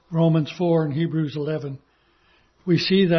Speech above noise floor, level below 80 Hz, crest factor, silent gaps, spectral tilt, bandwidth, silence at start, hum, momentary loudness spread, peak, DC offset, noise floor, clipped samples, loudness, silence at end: 40 dB; -60 dBFS; 14 dB; none; -8 dB/octave; 6.4 kHz; 0.1 s; none; 14 LU; -8 dBFS; under 0.1%; -61 dBFS; under 0.1%; -22 LUFS; 0 s